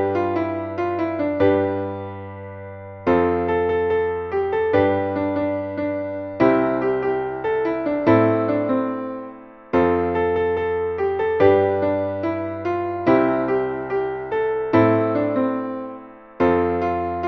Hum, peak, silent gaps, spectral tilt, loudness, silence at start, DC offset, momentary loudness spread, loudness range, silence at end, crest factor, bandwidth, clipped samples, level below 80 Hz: none; -2 dBFS; none; -9.5 dB/octave; -21 LUFS; 0 s; under 0.1%; 11 LU; 2 LU; 0 s; 18 dB; 6.2 kHz; under 0.1%; -50 dBFS